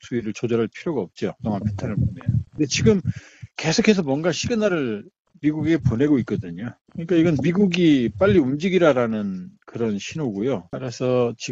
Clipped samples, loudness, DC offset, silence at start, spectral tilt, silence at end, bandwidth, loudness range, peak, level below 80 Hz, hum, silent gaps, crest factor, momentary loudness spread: under 0.1%; -22 LUFS; under 0.1%; 0.05 s; -6 dB/octave; 0 s; 7.8 kHz; 3 LU; -2 dBFS; -48 dBFS; none; 5.19-5.25 s, 6.81-6.85 s; 18 dB; 12 LU